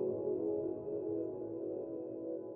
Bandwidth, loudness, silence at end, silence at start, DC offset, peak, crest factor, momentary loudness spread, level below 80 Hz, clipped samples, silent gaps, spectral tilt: 2.7 kHz; -40 LUFS; 0 s; 0 s; under 0.1%; -26 dBFS; 12 dB; 6 LU; -76 dBFS; under 0.1%; none; -10 dB/octave